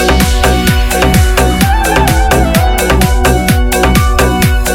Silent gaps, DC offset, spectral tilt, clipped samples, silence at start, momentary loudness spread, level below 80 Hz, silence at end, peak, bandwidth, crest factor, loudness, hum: none; under 0.1%; -4.5 dB/octave; 0.2%; 0 s; 1 LU; -12 dBFS; 0 s; 0 dBFS; 19.5 kHz; 8 dB; -10 LUFS; none